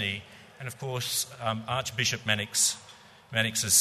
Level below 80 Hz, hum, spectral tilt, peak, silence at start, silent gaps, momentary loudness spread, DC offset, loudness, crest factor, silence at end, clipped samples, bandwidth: -64 dBFS; none; -1.5 dB/octave; -8 dBFS; 0 s; none; 14 LU; under 0.1%; -28 LUFS; 22 dB; 0 s; under 0.1%; 13.5 kHz